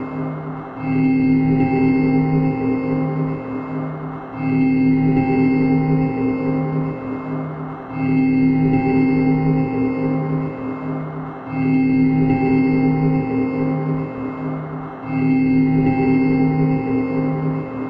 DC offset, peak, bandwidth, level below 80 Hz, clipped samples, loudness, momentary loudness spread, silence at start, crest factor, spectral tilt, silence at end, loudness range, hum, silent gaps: under 0.1%; -6 dBFS; 4.9 kHz; -42 dBFS; under 0.1%; -19 LUFS; 10 LU; 0 s; 12 dB; -11.5 dB/octave; 0 s; 1 LU; none; none